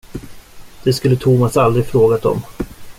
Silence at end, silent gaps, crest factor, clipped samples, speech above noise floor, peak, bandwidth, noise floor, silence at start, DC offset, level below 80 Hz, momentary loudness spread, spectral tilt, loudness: 0.05 s; none; 14 dB; under 0.1%; 22 dB; -2 dBFS; 16 kHz; -35 dBFS; 0.1 s; under 0.1%; -40 dBFS; 16 LU; -7 dB/octave; -15 LUFS